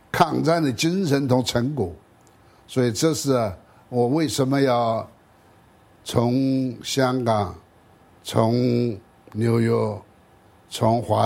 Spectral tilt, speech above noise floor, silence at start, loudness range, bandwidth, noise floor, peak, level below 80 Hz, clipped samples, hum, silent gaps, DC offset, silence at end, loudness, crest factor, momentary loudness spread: -6 dB/octave; 33 dB; 0.15 s; 2 LU; 16.5 kHz; -54 dBFS; -2 dBFS; -56 dBFS; under 0.1%; none; none; under 0.1%; 0 s; -22 LUFS; 20 dB; 11 LU